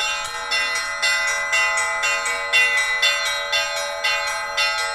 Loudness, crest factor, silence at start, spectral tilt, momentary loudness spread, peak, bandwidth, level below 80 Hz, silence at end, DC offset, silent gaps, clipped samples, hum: -19 LUFS; 16 dB; 0 s; 2 dB/octave; 6 LU; -4 dBFS; 16 kHz; -52 dBFS; 0 s; under 0.1%; none; under 0.1%; none